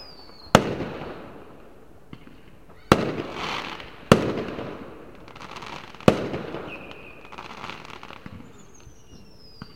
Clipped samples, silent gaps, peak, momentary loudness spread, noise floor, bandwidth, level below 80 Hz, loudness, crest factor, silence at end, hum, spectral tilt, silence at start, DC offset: under 0.1%; none; 0 dBFS; 24 LU; -50 dBFS; 16.5 kHz; -50 dBFS; -25 LUFS; 28 dB; 0.05 s; none; -5.5 dB/octave; 0 s; 0.4%